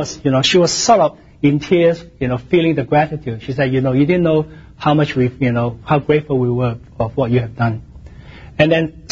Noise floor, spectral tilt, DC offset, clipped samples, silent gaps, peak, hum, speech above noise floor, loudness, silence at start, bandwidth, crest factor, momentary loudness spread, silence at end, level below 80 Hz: -37 dBFS; -5.5 dB/octave; under 0.1%; under 0.1%; none; 0 dBFS; none; 21 dB; -16 LUFS; 0 s; 7.8 kHz; 16 dB; 9 LU; 0.05 s; -42 dBFS